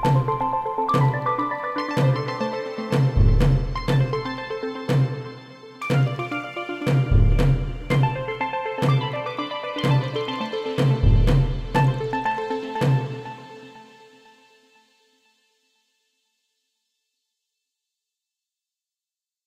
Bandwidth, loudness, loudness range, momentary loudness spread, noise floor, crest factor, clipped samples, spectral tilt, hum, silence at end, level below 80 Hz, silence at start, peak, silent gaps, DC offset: 11.5 kHz; -23 LUFS; 4 LU; 10 LU; under -90 dBFS; 16 dB; under 0.1%; -7.5 dB/octave; none; 5.65 s; -30 dBFS; 0 s; -6 dBFS; none; under 0.1%